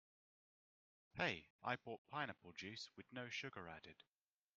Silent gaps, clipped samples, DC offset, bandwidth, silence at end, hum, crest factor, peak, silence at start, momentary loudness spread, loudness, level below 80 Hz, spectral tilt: 1.50-1.59 s, 1.98-2.05 s; under 0.1%; under 0.1%; 7.2 kHz; 0.65 s; none; 26 dB; -26 dBFS; 1.15 s; 14 LU; -49 LUFS; -82 dBFS; -2 dB/octave